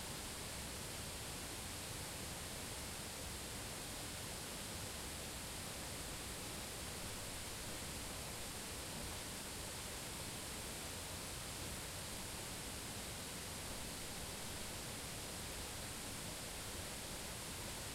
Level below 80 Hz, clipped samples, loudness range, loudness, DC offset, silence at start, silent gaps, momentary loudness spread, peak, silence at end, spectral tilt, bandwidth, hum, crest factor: -58 dBFS; under 0.1%; 0 LU; -46 LUFS; under 0.1%; 0 s; none; 0 LU; -34 dBFS; 0 s; -2.5 dB/octave; 16 kHz; none; 14 dB